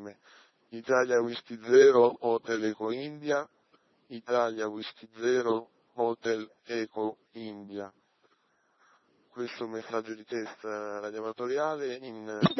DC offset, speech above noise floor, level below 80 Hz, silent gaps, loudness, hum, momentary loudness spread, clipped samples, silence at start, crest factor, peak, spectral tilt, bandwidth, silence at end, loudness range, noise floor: under 0.1%; 42 dB; -80 dBFS; none; -30 LUFS; none; 18 LU; under 0.1%; 0 s; 24 dB; -8 dBFS; -5.5 dB/octave; 6.2 kHz; 0 s; 14 LU; -71 dBFS